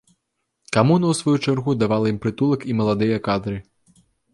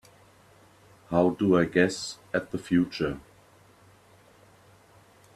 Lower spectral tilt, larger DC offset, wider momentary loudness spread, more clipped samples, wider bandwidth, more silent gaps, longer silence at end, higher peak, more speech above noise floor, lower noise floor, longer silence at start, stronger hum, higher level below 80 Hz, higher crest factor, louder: about the same, -6.5 dB/octave vs -6 dB/octave; neither; second, 6 LU vs 10 LU; neither; second, 11.5 kHz vs 13 kHz; neither; second, 0.75 s vs 2.15 s; first, -2 dBFS vs -8 dBFS; first, 56 dB vs 32 dB; first, -76 dBFS vs -57 dBFS; second, 0.7 s vs 1.1 s; neither; first, -52 dBFS vs -58 dBFS; about the same, 18 dB vs 22 dB; first, -20 LUFS vs -26 LUFS